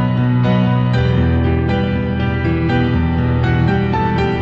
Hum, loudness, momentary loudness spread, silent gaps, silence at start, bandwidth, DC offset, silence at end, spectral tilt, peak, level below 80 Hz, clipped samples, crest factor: none; -16 LUFS; 3 LU; none; 0 s; 5.8 kHz; under 0.1%; 0 s; -9 dB/octave; -2 dBFS; -26 dBFS; under 0.1%; 12 dB